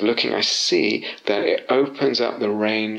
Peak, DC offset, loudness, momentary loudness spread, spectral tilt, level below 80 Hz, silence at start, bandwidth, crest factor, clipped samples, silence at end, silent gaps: -6 dBFS; under 0.1%; -20 LUFS; 4 LU; -3 dB/octave; -74 dBFS; 0 s; 10.5 kHz; 14 dB; under 0.1%; 0 s; none